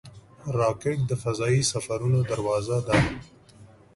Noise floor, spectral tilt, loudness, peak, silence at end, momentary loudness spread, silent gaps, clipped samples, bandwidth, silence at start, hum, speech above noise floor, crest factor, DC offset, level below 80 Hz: -51 dBFS; -5.5 dB/octave; -25 LUFS; -8 dBFS; 0.3 s; 6 LU; none; under 0.1%; 11.5 kHz; 0.05 s; none; 26 dB; 18 dB; under 0.1%; -46 dBFS